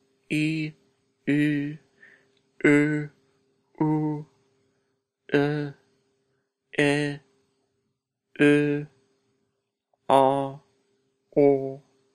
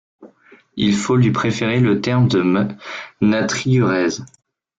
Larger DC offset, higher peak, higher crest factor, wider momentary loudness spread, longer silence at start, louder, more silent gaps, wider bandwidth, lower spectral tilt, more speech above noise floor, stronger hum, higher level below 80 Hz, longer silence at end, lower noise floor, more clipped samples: neither; about the same, -4 dBFS vs -4 dBFS; first, 22 dB vs 14 dB; first, 16 LU vs 11 LU; about the same, 0.3 s vs 0.2 s; second, -24 LUFS vs -17 LUFS; neither; first, 10.5 kHz vs 7.8 kHz; about the same, -7 dB/octave vs -6 dB/octave; first, 57 dB vs 33 dB; neither; second, -70 dBFS vs -52 dBFS; second, 0.35 s vs 0.55 s; first, -79 dBFS vs -49 dBFS; neither